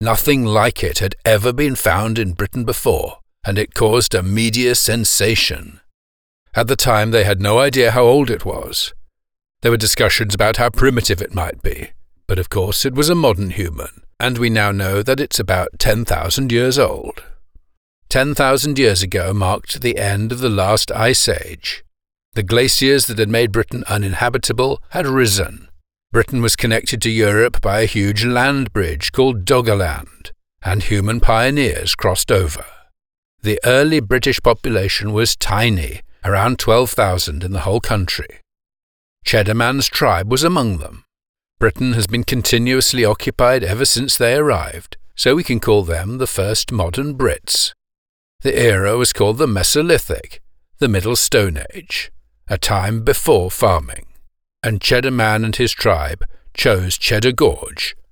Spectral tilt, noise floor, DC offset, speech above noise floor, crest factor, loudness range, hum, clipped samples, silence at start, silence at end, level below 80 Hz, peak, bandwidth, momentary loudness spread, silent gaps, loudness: -4 dB/octave; under -90 dBFS; 0.3%; over 74 dB; 16 dB; 3 LU; none; under 0.1%; 0 s; 0.1 s; -30 dBFS; -2 dBFS; over 20 kHz; 10 LU; 5.94-6.46 s, 17.77-18.02 s, 22.25-22.32 s, 33.18-33.38 s, 38.83-39.16 s, 41.29-41.34 s, 47.98-48.39 s; -16 LUFS